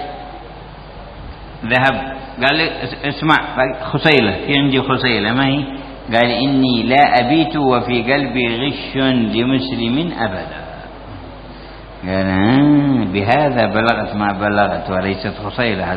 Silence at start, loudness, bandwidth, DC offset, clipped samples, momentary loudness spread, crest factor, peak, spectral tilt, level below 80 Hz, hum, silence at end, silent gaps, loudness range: 0 s; -15 LUFS; 5.8 kHz; under 0.1%; under 0.1%; 21 LU; 16 dB; 0 dBFS; -7.5 dB/octave; -38 dBFS; none; 0 s; none; 5 LU